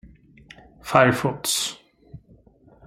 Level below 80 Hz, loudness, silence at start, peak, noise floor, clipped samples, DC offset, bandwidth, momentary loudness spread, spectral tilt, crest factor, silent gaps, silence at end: -56 dBFS; -21 LUFS; 0.05 s; -2 dBFS; -54 dBFS; under 0.1%; under 0.1%; 16.5 kHz; 20 LU; -3.5 dB/octave; 24 dB; none; 0.7 s